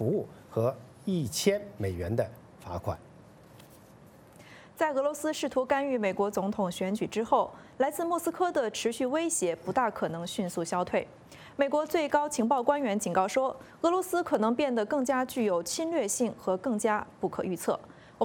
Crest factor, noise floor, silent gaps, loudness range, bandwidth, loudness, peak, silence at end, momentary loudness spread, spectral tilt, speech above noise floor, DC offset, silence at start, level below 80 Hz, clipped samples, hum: 18 dB; -54 dBFS; none; 6 LU; 17.5 kHz; -30 LUFS; -12 dBFS; 0 s; 8 LU; -4.5 dB/octave; 25 dB; under 0.1%; 0 s; -62 dBFS; under 0.1%; none